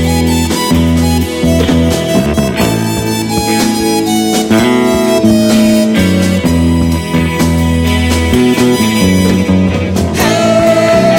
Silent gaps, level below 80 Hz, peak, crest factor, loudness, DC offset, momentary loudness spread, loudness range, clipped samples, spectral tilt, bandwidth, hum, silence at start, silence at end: none; -24 dBFS; 0 dBFS; 10 dB; -10 LUFS; 0.2%; 4 LU; 2 LU; under 0.1%; -5.5 dB/octave; 19 kHz; none; 0 s; 0 s